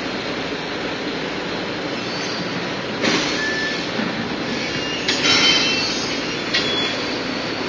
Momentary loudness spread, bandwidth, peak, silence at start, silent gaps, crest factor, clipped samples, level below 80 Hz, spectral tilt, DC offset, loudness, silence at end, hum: 10 LU; 8 kHz; -2 dBFS; 0 s; none; 20 dB; under 0.1%; -50 dBFS; -3 dB/octave; under 0.1%; -20 LUFS; 0 s; none